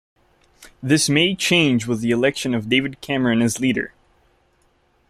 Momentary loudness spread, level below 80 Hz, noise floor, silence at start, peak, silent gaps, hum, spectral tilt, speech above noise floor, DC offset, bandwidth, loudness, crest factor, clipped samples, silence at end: 8 LU; -54 dBFS; -61 dBFS; 0.6 s; -2 dBFS; none; none; -4 dB/octave; 42 dB; under 0.1%; 15 kHz; -19 LUFS; 18 dB; under 0.1%; 1.2 s